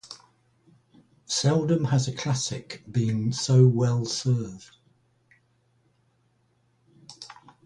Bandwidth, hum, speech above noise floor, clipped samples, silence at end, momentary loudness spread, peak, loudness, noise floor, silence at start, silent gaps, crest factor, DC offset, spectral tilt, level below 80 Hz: 11 kHz; none; 44 dB; under 0.1%; 0.35 s; 25 LU; -6 dBFS; -25 LUFS; -68 dBFS; 0.05 s; none; 20 dB; under 0.1%; -5.5 dB/octave; -60 dBFS